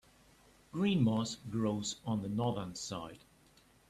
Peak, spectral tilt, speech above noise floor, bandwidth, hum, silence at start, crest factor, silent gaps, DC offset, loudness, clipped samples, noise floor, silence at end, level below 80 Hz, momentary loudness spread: -20 dBFS; -5.5 dB/octave; 31 dB; 13.5 kHz; none; 0.75 s; 18 dB; none; under 0.1%; -36 LUFS; under 0.1%; -65 dBFS; 0.7 s; -66 dBFS; 12 LU